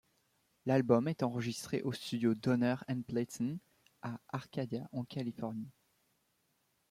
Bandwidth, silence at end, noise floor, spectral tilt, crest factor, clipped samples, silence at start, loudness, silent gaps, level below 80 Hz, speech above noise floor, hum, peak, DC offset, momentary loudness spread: 15.5 kHz; 1.2 s; -78 dBFS; -6.5 dB/octave; 24 dB; under 0.1%; 0.65 s; -36 LUFS; none; -74 dBFS; 43 dB; none; -14 dBFS; under 0.1%; 14 LU